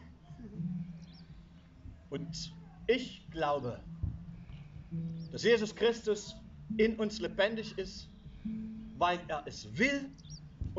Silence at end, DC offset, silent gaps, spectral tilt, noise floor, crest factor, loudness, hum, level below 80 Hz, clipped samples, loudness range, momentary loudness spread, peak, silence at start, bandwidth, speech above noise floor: 0 s; under 0.1%; none; -4 dB/octave; -55 dBFS; 20 dB; -35 LUFS; none; -54 dBFS; under 0.1%; 5 LU; 20 LU; -16 dBFS; 0 s; 7.6 kHz; 22 dB